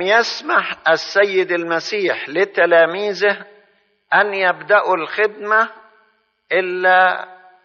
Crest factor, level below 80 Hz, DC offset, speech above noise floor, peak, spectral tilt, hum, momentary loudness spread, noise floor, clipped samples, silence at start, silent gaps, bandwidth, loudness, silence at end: 16 dB; -74 dBFS; under 0.1%; 43 dB; -2 dBFS; -0.5 dB/octave; none; 7 LU; -60 dBFS; under 0.1%; 0 s; none; 7 kHz; -16 LUFS; 0.3 s